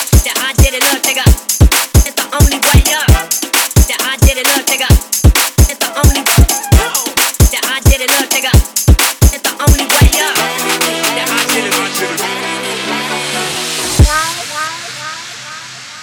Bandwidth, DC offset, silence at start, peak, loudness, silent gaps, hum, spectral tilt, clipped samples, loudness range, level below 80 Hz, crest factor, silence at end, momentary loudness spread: over 20 kHz; under 0.1%; 0 s; 0 dBFS; -11 LUFS; none; none; -3 dB/octave; 1%; 4 LU; -16 dBFS; 12 dB; 0 s; 8 LU